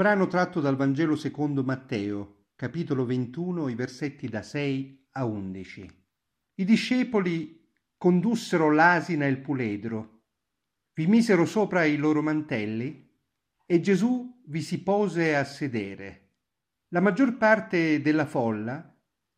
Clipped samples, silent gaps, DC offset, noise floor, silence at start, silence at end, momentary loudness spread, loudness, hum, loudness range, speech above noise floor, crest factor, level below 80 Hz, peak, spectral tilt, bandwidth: under 0.1%; none; under 0.1%; -84 dBFS; 0 s; 0.55 s; 14 LU; -26 LUFS; none; 6 LU; 59 dB; 20 dB; -70 dBFS; -6 dBFS; -7 dB/octave; 12.5 kHz